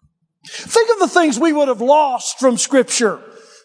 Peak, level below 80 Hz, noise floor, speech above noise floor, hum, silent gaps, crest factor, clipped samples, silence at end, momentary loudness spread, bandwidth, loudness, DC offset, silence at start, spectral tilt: 0 dBFS; -70 dBFS; -46 dBFS; 31 dB; none; none; 16 dB; under 0.1%; 0.45 s; 7 LU; 10.5 kHz; -15 LUFS; under 0.1%; 0.45 s; -2.5 dB/octave